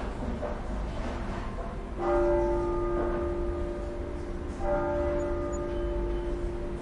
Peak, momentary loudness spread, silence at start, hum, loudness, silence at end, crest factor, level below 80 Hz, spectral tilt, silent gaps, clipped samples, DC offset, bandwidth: -14 dBFS; 9 LU; 0 s; none; -32 LUFS; 0 s; 16 dB; -36 dBFS; -7.5 dB/octave; none; under 0.1%; under 0.1%; 11 kHz